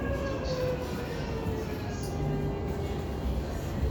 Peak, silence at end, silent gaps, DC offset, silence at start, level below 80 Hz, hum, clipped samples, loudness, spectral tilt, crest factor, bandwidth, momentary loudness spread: -18 dBFS; 0 s; none; under 0.1%; 0 s; -38 dBFS; none; under 0.1%; -33 LUFS; -6.5 dB/octave; 14 dB; over 20 kHz; 3 LU